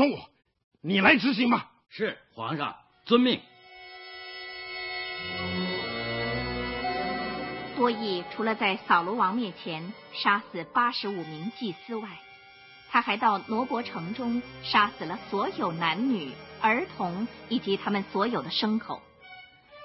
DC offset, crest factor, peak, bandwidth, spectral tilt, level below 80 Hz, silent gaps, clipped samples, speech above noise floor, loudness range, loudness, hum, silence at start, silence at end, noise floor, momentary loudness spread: under 0.1%; 22 dB; -6 dBFS; 6 kHz; -8 dB/octave; -58 dBFS; 0.64-0.71 s; under 0.1%; 24 dB; 5 LU; -28 LUFS; none; 0 s; 0 s; -52 dBFS; 16 LU